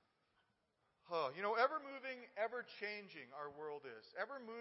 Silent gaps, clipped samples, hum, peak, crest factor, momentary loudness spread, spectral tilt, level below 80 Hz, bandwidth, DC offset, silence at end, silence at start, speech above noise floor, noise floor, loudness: none; under 0.1%; none; -22 dBFS; 24 dB; 14 LU; -1 dB/octave; under -90 dBFS; 5.8 kHz; under 0.1%; 0 s; 1.05 s; 39 dB; -83 dBFS; -44 LUFS